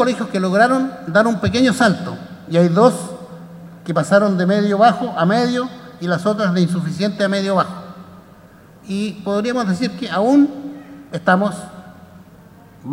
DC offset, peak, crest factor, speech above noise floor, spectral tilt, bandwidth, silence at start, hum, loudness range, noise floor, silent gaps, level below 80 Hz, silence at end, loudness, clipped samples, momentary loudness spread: under 0.1%; 0 dBFS; 18 dB; 28 dB; -6 dB/octave; 13 kHz; 0 s; none; 5 LU; -44 dBFS; none; -54 dBFS; 0 s; -17 LUFS; under 0.1%; 19 LU